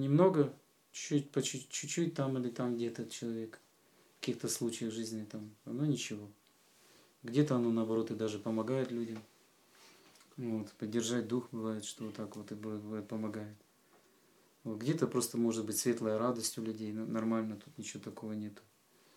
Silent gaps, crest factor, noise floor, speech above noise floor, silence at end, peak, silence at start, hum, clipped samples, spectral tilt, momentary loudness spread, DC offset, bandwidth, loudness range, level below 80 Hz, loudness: none; 22 dB; -68 dBFS; 32 dB; 0.6 s; -14 dBFS; 0 s; none; under 0.1%; -5.5 dB/octave; 12 LU; under 0.1%; 17.5 kHz; 5 LU; -90 dBFS; -37 LUFS